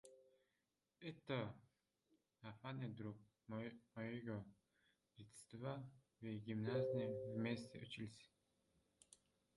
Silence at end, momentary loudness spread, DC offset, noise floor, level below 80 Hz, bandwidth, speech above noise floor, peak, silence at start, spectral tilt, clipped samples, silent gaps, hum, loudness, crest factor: 0.4 s; 20 LU; under 0.1%; -90 dBFS; -82 dBFS; 11 kHz; 41 dB; -32 dBFS; 0.05 s; -7 dB/octave; under 0.1%; none; none; -49 LUFS; 20 dB